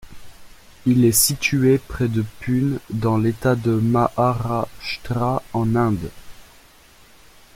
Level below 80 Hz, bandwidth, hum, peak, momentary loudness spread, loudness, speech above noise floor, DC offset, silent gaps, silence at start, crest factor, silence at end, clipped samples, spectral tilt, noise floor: -44 dBFS; 16.5 kHz; none; -2 dBFS; 10 LU; -20 LUFS; 30 dB; under 0.1%; none; 0.05 s; 18 dB; 1.15 s; under 0.1%; -5.5 dB/octave; -49 dBFS